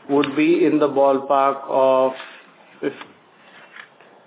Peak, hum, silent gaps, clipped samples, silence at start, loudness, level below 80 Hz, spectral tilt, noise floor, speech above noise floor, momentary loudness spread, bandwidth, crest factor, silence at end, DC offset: -4 dBFS; none; none; under 0.1%; 0.1 s; -18 LUFS; -76 dBFS; -10 dB/octave; -48 dBFS; 31 dB; 15 LU; 4 kHz; 16 dB; 0.45 s; under 0.1%